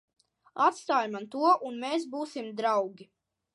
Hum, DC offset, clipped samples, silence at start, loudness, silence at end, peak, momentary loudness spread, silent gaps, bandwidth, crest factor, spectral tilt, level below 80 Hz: none; under 0.1%; under 0.1%; 0.55 s; -29 LUFS; 0.5 s; -10 dBFS; 11 LU; none; 11.5 kHz; 20 dB; -4 dB/octave; -88 dBFS